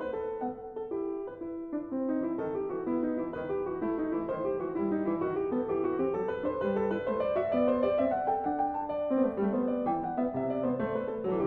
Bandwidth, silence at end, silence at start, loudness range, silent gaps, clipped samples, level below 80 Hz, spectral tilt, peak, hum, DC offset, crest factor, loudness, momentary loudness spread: 4.5 kHz; 0 s; 0 s; 4 LU; none; under 0.1%; -60 dBFS; -10 dB/octave; -16 dBFS; none; under 0.1%; 14 dB; -31 LUFS; 7 LU